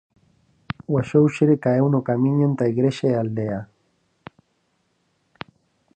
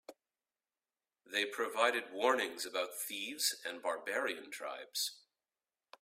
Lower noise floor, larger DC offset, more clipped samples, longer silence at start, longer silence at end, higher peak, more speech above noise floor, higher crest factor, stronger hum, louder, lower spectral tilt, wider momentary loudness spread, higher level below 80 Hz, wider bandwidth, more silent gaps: second, -69 dBFS vs under -90 dBFS; neither; neither; first, 0.9 s vs 0.1 s; first, 2.3 s vs 0.8 s; first, -6 dBFS vs -16 dBFS; second, 49 dB vs over 53 dB; about the same, 18 dB vs 22 dB; neither; first, -20 LUFS vs -36 LUFS; first, -8.5 dB/octave vs 0 dB/octave; first, 20 LU vs 8 LU; first, -58 dBFS vs -88 dBFS; second, 8.8 kHz vs 16 kHz; neither